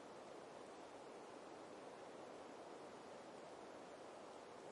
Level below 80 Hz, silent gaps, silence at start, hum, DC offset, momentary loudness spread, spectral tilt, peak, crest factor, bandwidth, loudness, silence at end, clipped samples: under -90 dBFS; none; 0 s; none; under 0.1%; 1 LU; -4 dB/octave; -44 dBFS; 12 dB; 11 kHz; -57 LUFS; 0 s; under 0.1%